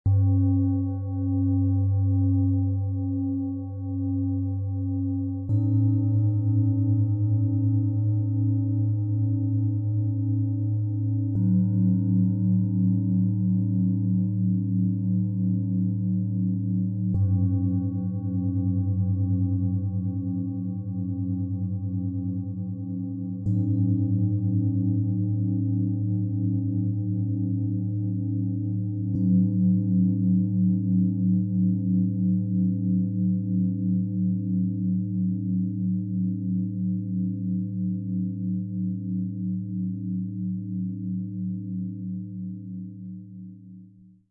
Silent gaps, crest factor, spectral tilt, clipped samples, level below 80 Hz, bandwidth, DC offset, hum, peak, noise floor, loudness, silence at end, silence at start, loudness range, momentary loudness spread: none; 12 dB; -16 dB/octave; under 0.1%; -60 dBFS; 1.2 kHz; under 0.1%; none; -12 dBFS; -51 dBFS; -26 LUFS; 0.45 s; 0.05 s; 6 LU; 8 LU